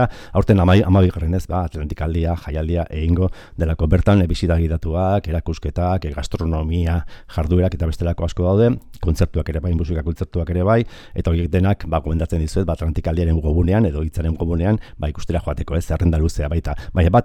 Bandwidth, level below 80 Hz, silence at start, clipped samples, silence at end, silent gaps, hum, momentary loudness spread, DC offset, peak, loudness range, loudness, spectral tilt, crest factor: 9.4 kHz; -26 dBFS; 0 s; under 0.1%; 0 s; none; none; 8 LU; under 0.1%; -2 dBFS; 2 LU; -20 LUFS; -8 dB/octave; 16 dB